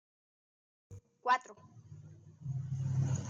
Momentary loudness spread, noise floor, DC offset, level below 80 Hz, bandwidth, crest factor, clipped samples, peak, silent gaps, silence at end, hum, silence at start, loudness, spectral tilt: 24 LU; -54 dBFS; under 0.1%; -68 dBFS; 7.6 kHz; 20 dB; under 0.1%; -20 dBFS; none; 0 s; none; 0.9 s; -36 LUFS; -6 dB/octave